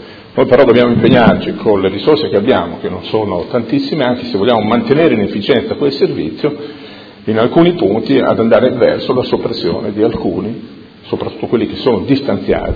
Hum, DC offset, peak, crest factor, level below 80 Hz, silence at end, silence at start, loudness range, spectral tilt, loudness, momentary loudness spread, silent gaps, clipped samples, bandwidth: none; under 0.1%; 0 dBFS; 12 dB; -40 dBFS; 0 s; 0 s; 5 LU; -9 dB/octave; -13 LUFS; 11 LU; none; 0.3%; 5.4 kHz